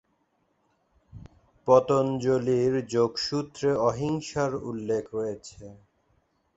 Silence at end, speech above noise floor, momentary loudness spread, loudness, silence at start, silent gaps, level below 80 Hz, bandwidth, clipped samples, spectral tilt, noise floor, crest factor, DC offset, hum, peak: 0.8 s; 46 dB; 12 LU; -26 LUFS; 1.15 s; none; -60 dBFS; 8.2 kHz; under 0.1%; -6 dB/octave; -71 dBFS; 22 dB; under 0.1%; none; -6 dBFS